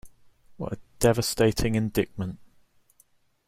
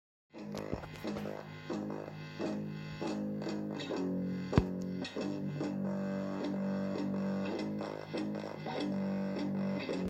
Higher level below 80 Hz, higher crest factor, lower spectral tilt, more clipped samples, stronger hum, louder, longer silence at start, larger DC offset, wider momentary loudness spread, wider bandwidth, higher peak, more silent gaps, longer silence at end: first, -44 dBFS vs -54 dBFS; about the same, 22 dB vs 26 dB; second, -5 dB/octave vs -7 dB/octave; neither; neither; first, -26 LUFS vs -38 LUFS; second, 0.05 s vs 0.35 s; neither; first, 13 LU vs 6 LU; first, 16.5 kHz vs 8.6 kHz; first, -6 dBFS vs -10 dBFS; neither; first, 1.05 s vs 0 s